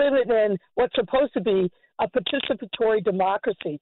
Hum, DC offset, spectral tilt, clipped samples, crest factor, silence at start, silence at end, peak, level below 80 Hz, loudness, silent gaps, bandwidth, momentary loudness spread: none; under 0.1%; -10 dB/octave; under 0.1%; 10 dB; 0 s; 0.05 s; -12 dBFS; -56 dBFS; -24 LUFS; none; 4.3 kHz; 6 LU